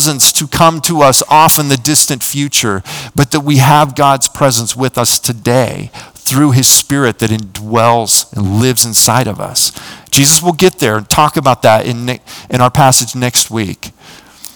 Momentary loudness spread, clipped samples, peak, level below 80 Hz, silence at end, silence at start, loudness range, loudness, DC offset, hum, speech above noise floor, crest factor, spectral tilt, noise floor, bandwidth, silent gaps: 12 LU; 2%; 0 dBFS; -42 dBFS; 0.1 s; 0 s; 2 LU; -10 LUFS; under 0.1%; none; 25 dB; 10 dB; -3.5 dB/octave; -35 dBFS; over 20 kHz; none